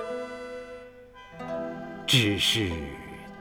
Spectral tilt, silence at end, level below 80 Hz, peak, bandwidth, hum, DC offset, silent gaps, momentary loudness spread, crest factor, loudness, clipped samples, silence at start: -3.5 dB/octave; 0 s; -50 dBFS; -8 dBFS; over 20 kHz; none; under 0.1%; none; 22 LU; 22 dB; -26 LUFS; under 0.1%; 0 s